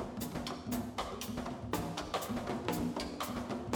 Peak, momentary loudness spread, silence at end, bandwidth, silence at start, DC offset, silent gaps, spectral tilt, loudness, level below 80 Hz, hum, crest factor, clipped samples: -18 dBFS; 4 LU; 0 s; over 20 kHz; 0 s; under 0.1%; none; -5 dB/octave; -39 LUFS; -54 dBFS; none; 20 dB; under 0.1%